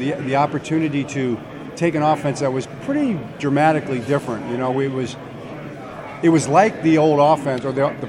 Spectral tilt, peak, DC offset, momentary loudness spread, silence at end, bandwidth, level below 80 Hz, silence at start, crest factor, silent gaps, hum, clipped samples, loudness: -6.5 dB/octave; 0 dBFS; under 0.1%; 18 LU; 0 s; 12 kHz; -56 dBFS; 0 s; 18 dB; none; none; under 0.1%; -19 LUFS